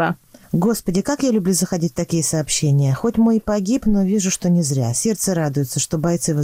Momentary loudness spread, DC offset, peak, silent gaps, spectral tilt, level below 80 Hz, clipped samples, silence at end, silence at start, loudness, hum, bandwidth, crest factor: 4 LU; under 0.1%; -8 dBFS; none; -5.5 dB/octave; -40 dBFS; under 0.1%; 0 s; 0 s; -19 LUFS; none; 16 kHz; 10 dB